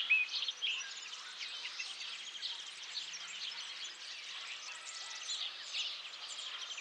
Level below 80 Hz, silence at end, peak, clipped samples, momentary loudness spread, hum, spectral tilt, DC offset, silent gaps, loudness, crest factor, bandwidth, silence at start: under -90 dBFS; 0 s; -20 dBFS; under 0.1%; 8 LU; none; 4 dB/octave; under 0.1%; none; -40 LUFS; 22 dB; 14.5 kHz; 0 s